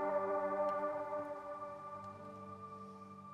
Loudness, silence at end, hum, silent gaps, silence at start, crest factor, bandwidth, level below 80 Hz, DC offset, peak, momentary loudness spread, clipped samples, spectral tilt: -42 LUFS; 0 s; none; none; 0 s; 16 dB; 9.6 kHz; -80 dBFS; under 0.1%; -26 dBFS; 14 LU; under 0.1%; -7 dB/octave